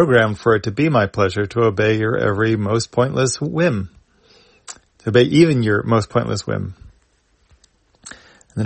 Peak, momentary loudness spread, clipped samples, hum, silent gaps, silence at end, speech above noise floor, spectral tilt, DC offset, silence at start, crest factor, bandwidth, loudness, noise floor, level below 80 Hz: 0 dBFS; 19 LU; under 0.1%; none; none; 0 s; 44 dB; -6 dB/octave; under 0.1%; 0 s; 18 dB; 8.8 kHz; -18 LUFS; -60 dBFS; -50 dBFS